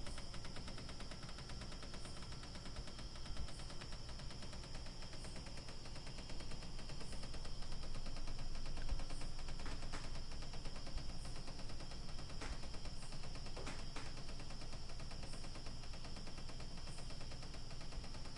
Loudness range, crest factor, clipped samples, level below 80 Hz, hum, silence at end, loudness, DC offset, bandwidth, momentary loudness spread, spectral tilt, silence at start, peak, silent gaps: 2 LU; 14 dB; under 0.1%; -48 dBFS; none; 0 s; -51 LUFS; under 0.1%; 11.5 kHz; 2 LU; -4 dB/octave; 0 s; -30 dBFS; none